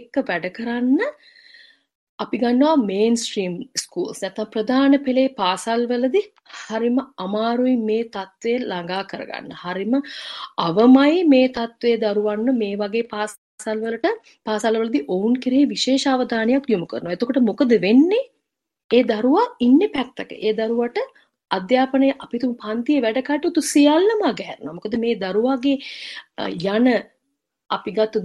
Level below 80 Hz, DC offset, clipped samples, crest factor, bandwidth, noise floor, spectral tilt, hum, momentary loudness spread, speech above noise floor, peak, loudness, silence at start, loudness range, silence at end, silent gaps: -64 dBFS; under 0.1%; under 0.1%; 18 dB; 12.5 kHz; -75 dBFS; -4.5 dB/octave; none; 13 LU; 56 dB; -2 dBFS; -20 LUFS; 0 s; 5 LU; 0 s; 1.95-2.18 s, 13.38-13.58 s, 18.84-18.89 s